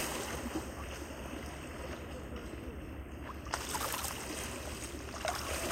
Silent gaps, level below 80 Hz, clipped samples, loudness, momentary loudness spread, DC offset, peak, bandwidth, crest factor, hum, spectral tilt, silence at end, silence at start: none; -48 dBFS; under 0.1%; -40 LUFS; 9 LU; under 0.1%; -14 dBFS; 16 kHz; 26 dB; none; -3.5 dB/octave; 0 s; 0 s